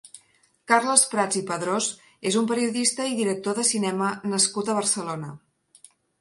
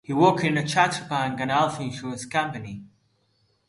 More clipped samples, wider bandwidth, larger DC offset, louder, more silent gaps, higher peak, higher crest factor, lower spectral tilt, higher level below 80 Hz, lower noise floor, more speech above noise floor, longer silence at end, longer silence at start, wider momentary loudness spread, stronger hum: neither; about the same, 11.5 kHz vs 11.5 kHz; neither; about the same, -23 LUFS vs -24 LUFS; neither; first, 0 dBFS vs -4 dBFS; about the same, 24 dB vs 20 dB; second, -2.5 dB/octave vs -5 dB/octave; second, -72 dBFS vs -62 dBFS; second, -62 dBFS vs -68 dBFS; second, 38 dB vs 44 dB; about the same, 0.85 s vs 0.85 s; about the same, 0.05 s vs 0.1 s; second, 9 LU vs 14 LU; neither